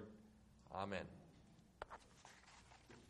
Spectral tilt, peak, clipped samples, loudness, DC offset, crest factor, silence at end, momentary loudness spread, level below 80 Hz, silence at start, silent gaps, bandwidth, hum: -5 dB/octave; -30 dBFS; under 0.1%; -54 LUFS; under 0.1%; 26 dB; 0 s; 20 LU; -74 dBFS; 0 s; none; 12 kHz; none